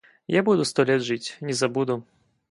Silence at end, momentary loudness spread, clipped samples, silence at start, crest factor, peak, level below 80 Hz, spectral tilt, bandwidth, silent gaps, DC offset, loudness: 0.5 s; 8 LU; under 0.1%; 0.3 s; 18 dB; -6 dBFS; -68 dBFS; -5 dB/octave; 11.5 kHz; none; under 0.1%; -24 LUFS